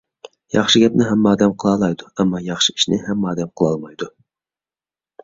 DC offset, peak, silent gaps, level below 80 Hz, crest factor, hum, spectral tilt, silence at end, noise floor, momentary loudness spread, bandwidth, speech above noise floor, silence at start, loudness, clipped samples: under 0.1%; -2 dBFS; none; -52 dBFS; 18 dB; none; -4.5 dB/octave; 1.15 s; under -90 dBFS; 10 LU; 7.8 kHz; over 73 dB; 0.55 s; -17 LUFS; under 0.1%